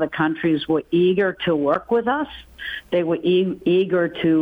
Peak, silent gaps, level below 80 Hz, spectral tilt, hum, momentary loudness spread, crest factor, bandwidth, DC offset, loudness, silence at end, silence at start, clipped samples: -8 dBFS; none; -54 dBFS; -8.5 dB/octave; none; 7 LU; 12 dB; 4.8 kHz; under 0.1%; -20 LUFS; 0 s; 0 s; under 0.1%